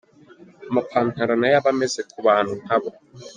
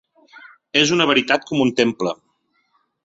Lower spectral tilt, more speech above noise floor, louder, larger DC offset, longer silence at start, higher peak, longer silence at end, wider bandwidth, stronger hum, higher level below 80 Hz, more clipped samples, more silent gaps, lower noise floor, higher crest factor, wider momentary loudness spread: first, -5 dB/octave vs -3.5 dB/octave; second, 28 dB vs 49 dB; second, -21 LUFS vs -18 LUFS; neither; second, 0.6 s vs 0.75 s; about the same, -4 dBFS vs -2 dBFS; second, 0.05 s vs 0.9 s; first, 9.8 kHz vs 8 kHz; neither; about the same, -64 dBFS vs -60 dBFS; neither; neither; second, -49 dBFS vs -67 dBFS; about the same, 18 dB vs 20 dB; second, 7 LU vs 11 LU